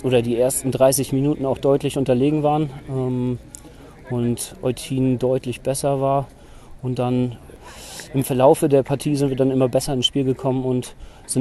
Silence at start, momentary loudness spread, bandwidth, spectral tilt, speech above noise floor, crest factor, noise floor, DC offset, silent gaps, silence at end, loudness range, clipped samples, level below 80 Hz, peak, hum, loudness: 0 s; 13 LU; 12.5 kHz; -5.5 dB/octave; 22 dB; 18 dB; -42 dBFS; under 0.1%; none; 0 s; 4 LU; under 0.1%; -46 dBFS; -2 dBFS; none; -20 LUFS